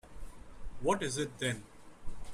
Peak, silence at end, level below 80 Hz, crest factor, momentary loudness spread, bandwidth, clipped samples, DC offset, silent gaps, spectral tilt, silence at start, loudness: -18 dBFS; 0 s; -50 dBFS; 20 dB; 21 LU; 14.5 kHz; under 0.1%; under 0.1%; none; -4 dB/octave; 0.05 s; -35 LUFS